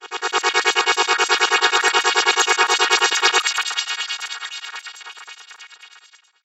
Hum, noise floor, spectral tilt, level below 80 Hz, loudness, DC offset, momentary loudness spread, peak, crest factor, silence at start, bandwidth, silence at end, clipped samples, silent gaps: none; -51 dBFS; 2.5 dB/octave; -76 dBFS; -17 LUFS; under 0.1%; 19 LU; 0 dBFS; 20 dB; 0 s; 16.5 kHz; 0.6 s; under 0.1%; none